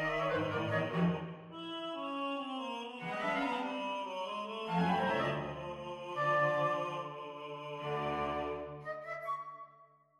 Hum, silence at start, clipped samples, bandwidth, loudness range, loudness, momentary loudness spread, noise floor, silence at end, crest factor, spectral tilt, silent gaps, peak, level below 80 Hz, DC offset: none; 0 s; under 0.1%; 11.5 kHz; 4 LU; -36 LUFS; 12 LU; -63 dBFS; 0.35 s; 18 dB; -6.5 dB/octave; none; -20 dBFS; -66 dBFS; under 0.1%